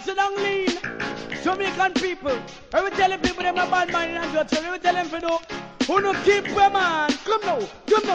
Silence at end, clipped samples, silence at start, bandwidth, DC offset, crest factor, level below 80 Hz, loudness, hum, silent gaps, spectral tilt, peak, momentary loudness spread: 0 s; under 0.1%; 0 s; 9.4 kHz; 0.1%; 16 dB; -50 dBFS; -23 LUFS; none; none; -3.5 dB/octave; -6 dBFS; 8 LU